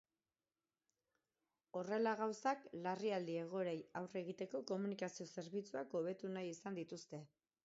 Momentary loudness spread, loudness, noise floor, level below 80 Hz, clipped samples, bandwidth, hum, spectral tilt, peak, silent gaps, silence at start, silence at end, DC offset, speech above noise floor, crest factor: 9 LU; -45 LUFS; under -90 dBFS; under -90 dBFS; under 0.1%; 7.6 kHz; none; -5 dB/octave; -26 dBFS; none; 1.75 s; 0.4 s; under 0.1%; over 46 dB; 20 dB